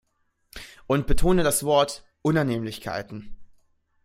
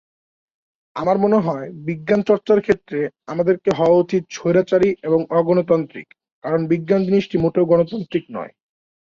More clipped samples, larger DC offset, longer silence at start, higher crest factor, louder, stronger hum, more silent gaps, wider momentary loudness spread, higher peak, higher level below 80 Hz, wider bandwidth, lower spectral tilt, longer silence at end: neither; neither; second, 0.55 s vs 0.95 s; about the same, 16 dB vs 16 dB; second, -24 LUFS vs -19 LUFS; neither; second, none vs 6.32-6.42 s; first, 21 LU vs 11 LU; second, -8 dBFS vs -2 dBFS; first, -36 dBFS vs -54 dBFS; first, 16 kHz vs 7.4 kHz; second, -5 dB/octave vs -7.5 dB/octave; about the same, 0.6 s vs 0.55 s